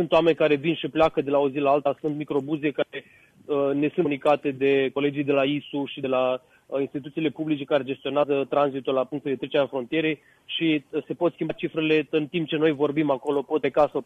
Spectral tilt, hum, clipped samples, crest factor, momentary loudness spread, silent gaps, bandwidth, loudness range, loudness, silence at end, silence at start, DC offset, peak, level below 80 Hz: -7.5 dB/octave; none; under 0.1%; 16 dB; 7 LU; none; 8.6 kHz; 2 LU; -25 LUFS; 0 s; 0 s; under 0.1%; -8 dBFS; -62 dBFS